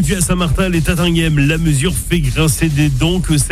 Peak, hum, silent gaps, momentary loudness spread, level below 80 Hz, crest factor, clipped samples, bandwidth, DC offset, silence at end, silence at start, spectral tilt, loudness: -2 dBFS; none; none; 2 LU; -22 dBFS; 12 dB; under 0.1%; 15.5 kHz; under 0.1%; 0 s; 0 s; -5 dB/octave; -14 LUFS